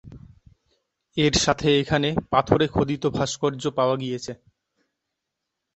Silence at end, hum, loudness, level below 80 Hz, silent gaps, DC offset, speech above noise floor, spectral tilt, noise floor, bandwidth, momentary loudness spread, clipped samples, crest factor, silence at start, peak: 1.4 s; none; -23 LUFS; -46 dBFS; none; under 0.1%; 60 dB; -4.5 dB/octave; -82 dBFS; 8.4 kHz; 12 LU; under 0.1%; 22 dB; 0.05 s; -4 dBFS